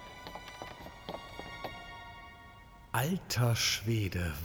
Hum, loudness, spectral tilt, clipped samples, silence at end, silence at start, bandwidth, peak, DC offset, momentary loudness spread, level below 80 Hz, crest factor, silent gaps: none; -34 LUFS; -4 dB/octave; under 0.1%; 0 s; 0 s; 19.5 kHz; -18 dBFS; under 0.1%; 21 LU; -54 dBFS; 18 dB; none